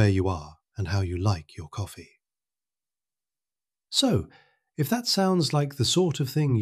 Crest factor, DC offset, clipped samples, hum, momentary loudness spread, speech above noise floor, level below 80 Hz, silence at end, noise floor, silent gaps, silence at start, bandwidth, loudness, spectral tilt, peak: 20 dB; under 0.1%; under 0.1%; none; 16 LU; over 65 dB; -52 dBFS; 0 s; under -90 dBFS; none; 0 s; 15.5 kHz; -26 LUFS; -5 dB/octave; -8 dBFS